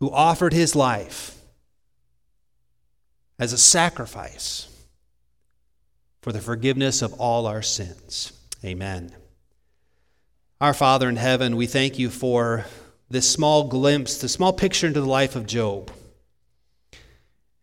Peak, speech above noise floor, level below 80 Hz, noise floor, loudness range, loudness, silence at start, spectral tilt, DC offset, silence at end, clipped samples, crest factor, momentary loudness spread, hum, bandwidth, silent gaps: 0 dBFS; 52 dB; -50 dBFS; -74 dBFS; 6 LU; -21 LUFS; 0 s; -3.5 dB/octave; under 0.1%; 1.65 s; under 0.1%; 24 dB; 15 LU; none; 17 kHz; none